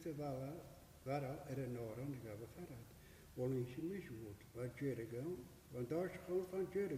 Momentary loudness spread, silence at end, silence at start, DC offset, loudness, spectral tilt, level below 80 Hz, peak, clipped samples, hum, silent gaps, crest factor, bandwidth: 12 LU; 0 s; 0 s; under 0.1%; -47 LUFS; -7.5 dB/octave; -68 dBFS; -30 dBFS; under 0.1%; none; none; 16 dB; 15.5 kHz